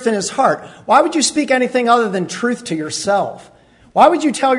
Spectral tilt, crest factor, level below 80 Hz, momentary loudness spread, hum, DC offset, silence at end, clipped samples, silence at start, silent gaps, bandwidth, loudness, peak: -3.5 dB/octave; 16 dB; -60 dBFS; 10 LU; none; under 0.1%; 0 s; under 0.1%; 0 s; none; 11 kHz; -15 LUFS; 0 dBFS